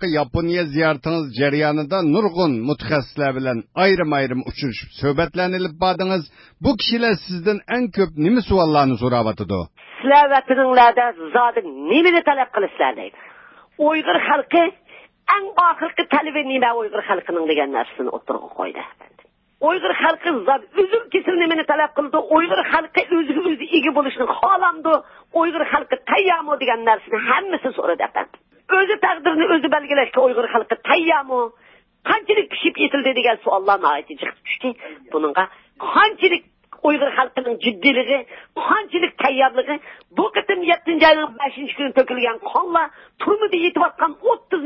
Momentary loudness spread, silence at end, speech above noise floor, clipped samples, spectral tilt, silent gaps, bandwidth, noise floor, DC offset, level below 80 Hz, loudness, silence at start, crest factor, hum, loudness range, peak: 9 LU; 0 s; 28 dB; under 0.1%; -9.5 dB/octave; none; 5.8 kHz; -46 dBFS; under 0.1%; -48 dBFS; -18 LUFS; 0 s; 16 dB; none; 4 LU; -2 dBFS